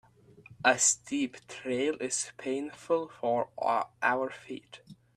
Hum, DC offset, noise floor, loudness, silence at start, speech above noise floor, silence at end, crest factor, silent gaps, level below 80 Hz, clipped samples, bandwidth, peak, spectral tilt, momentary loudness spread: none; under 0.1%; -56 dBFS; -30 LUFS; 0.5 s; 25 dB; 0.25 s; 22 dB; none; -74 dBFS; under 0.1%; 14 kHz; -8 dBFS; -2 dB/octave; 12 LU